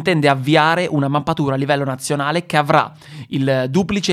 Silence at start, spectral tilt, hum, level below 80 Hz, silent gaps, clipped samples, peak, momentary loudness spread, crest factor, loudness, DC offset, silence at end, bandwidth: 0 s; -5.5 dB/octave; none; -52 dBFS; none; under 0.1%; 0 dBFS; 7 LU; 16 dB; -17 LUFS; under 0.1%; 0 s; 14.5 kHz